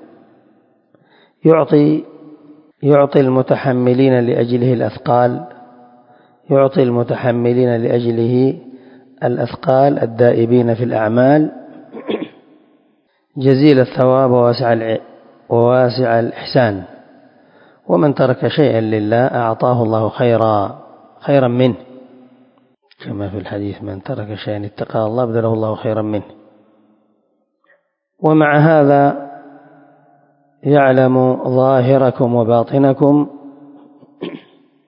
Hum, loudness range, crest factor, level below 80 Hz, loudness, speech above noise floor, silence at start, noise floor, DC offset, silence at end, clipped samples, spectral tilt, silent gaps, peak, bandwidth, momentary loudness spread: none; 7 LU; 16 dB; -54 dBFS; -14 LUFS; 50 dB; 1.45 s; -63 dBFS; under 0.1%; 0.5 s; under 0.1%; -11 dB/octave; none; 0 dBFS; 5.4 kHz; 13 LU